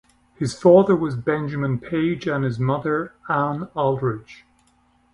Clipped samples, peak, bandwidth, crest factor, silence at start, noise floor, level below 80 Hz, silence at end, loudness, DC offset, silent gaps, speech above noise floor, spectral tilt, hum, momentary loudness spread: under 0.1%; -2 dBFS; 11.5 kHz; 20 dB; 0.4 s; -61 dBFS; -56 dBFS; 0.8 s; -21 LUFS; under 0.1%; none; 40 dB; -7.5 dB/octave; none; 11 LU